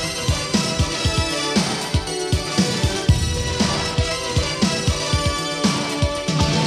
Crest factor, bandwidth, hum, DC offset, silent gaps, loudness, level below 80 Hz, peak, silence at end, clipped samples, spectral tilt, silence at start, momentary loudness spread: 18 dB; 14.5 kHz; none; under 0.1%; none; -20 LUFS; -30 dBFS; -4 dBFS; 0 s; under 0.1%; -4 dB/octave; 0 s; 3 LU